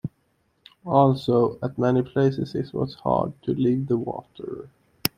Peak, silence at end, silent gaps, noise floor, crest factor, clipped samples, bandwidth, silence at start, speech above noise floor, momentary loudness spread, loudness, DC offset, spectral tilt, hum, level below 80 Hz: 0 dBFS; 0.1 s; none; -68 dBFS; 24 dB; under 0.1%; 16.5 kHz; 0.05 s; 45 dB; 17 LU; -23 LUFS; under 0.1%; -7 dB/octave; none; -56 dBFS